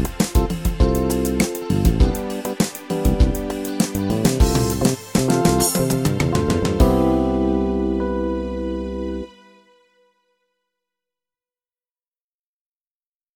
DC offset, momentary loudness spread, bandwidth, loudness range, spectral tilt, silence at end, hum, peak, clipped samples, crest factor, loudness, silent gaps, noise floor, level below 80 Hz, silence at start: under 0.1%; 9 LU; 19 kHz; 11 LU; -5.5 dB/octave; 4.05 s; none; -2 dBFS; under 0.1%; 18 dB; -20 LUFS; none; under -90 dBFS; -26 dBFS; 0 s